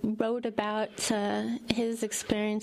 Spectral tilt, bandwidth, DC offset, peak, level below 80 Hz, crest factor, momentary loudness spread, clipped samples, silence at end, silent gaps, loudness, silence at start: -4 dB/octave; 15 kHz; under 0.1%; -8 dBFS; -58 dBFS; 22 dB; 2 LU; under 0.1%; 0 s; none; -30 LUFS; 0 s